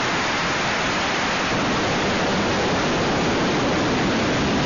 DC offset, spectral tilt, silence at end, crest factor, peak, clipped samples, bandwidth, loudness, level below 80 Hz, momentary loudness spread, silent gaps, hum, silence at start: 0.2%; -3 dB/octave; 0 s; 8 dB; -12 dBFS; under 0.1%; 7.2 kHz; -21 LUFS; -40 dBFS; 1 LU; none; none; 0 s